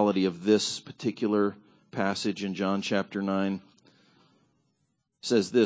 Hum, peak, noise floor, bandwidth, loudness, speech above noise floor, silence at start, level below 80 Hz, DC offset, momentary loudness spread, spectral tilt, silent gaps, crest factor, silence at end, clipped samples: none; -10 dBFS; -76 dBFS; 8 kHz; -28 LUFS; 49 dB; 0 s; -68 dBFS; under 0.1%; 8 LU; -5 dB/octave; none; 18 dB; 0 s; under 0.1%